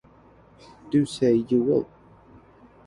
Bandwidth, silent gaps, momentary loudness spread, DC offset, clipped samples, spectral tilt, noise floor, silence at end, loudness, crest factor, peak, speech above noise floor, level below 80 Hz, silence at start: 11.5 kHz; none; 5 LU; under 0.1%; under 0.1%; -7 dB/octave; -53 dBFS; 1.05 s; -23 LUFS; 16 dB; -10 dBFS; 31 dB; -60 dBFS; 0.85 s